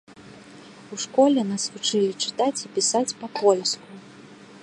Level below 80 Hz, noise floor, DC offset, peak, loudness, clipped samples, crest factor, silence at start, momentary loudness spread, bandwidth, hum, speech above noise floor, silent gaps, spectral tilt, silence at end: -74 dBFS; -46 dBFS; under 0.1%; -6 dBFS; -23 LUFS; under 0.1%; 20 dB; 0.1 s; 13 LU; 11.5 kHz; none; 23 dB; none; -3 dB/octave; 0.05 s